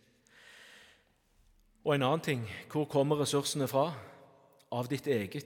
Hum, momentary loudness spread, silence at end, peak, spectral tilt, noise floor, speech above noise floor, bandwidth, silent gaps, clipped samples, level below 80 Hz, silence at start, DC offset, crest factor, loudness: none; 10 LU; 0 s; -14 dBFS; -5 dB/octave; -69 dBFS; 37 dB; 18 kHz; none; under 0.1%; -74 dBFS; 0.5 s; under 0.1%; 20 dB; -32 LUFS